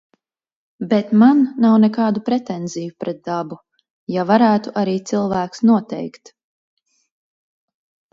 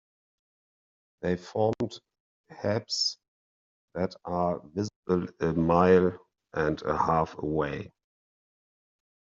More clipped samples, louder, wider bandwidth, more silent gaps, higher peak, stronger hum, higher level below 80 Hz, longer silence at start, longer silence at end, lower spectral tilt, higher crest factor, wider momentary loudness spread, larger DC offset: neither; first, -17 LUFS vs -28 LUFS; about the same, 7.6 kHz vs 7.6 kHz; second, 3.90-4.07 s vs 2.20-2.44 s, 3.28-3.88 s, 4.96-5.03 s; first, -2 dBFS vs -8 dBFS; neither; about the same, -62 dBFS vs -58 dBFS; second, 0.8 s vs 1.2 s; first, 2.05 s vs 1.4 s; first, -7 dB/octave vs -5 dB/octave; about the same, 18 dB vs 22 dB; about the same, 16 LU vs 14 LU; neither